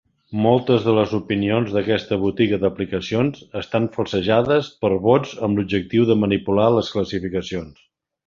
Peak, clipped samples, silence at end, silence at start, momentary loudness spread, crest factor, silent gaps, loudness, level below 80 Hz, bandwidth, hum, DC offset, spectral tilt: -2 dBFS; under 0.1%; 0.55 s; 0.3 s; 8 LU; 18 dB; none; -20 LUFS; -48 dBFS; 7.4 kHz; none; under 0.1%; -7.5 dB/octave